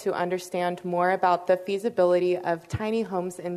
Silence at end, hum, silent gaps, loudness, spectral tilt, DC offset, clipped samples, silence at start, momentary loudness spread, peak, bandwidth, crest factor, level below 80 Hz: 0 s; none; none; -26 LUFS; -6 dB/octave; under 0.1%; under 0.1%; 0 s; 7 LU; -10 dBFS; 13.5 kHz; 16 dB; -60 dBFS